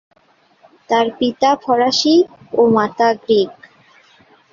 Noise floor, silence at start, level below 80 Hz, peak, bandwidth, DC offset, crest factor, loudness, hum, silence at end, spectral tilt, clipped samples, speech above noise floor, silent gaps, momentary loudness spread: -55 dBFS; 0.9 s; -60 dBFS; -2 dBFS; 7.6 kHz; under 0.1%; 14 dB; -15 LUFS; none; 1 s; -4 dB/octave; under 0.1%; 41 dB; none; 5 LU